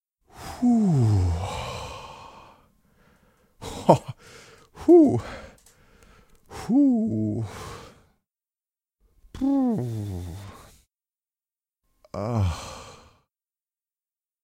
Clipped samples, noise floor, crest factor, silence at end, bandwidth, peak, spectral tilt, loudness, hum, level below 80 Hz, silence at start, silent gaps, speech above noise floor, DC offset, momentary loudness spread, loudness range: under 0.1%; under -90 dBFS; 24 dB; 1.5 s; 15 kHz; -2 dBFS; -8 dB/octave; -23 LUFS; none; -48 dBFS; 0.35 s; none; over 69 dB; under 0.1%; 23 LU; 11 LU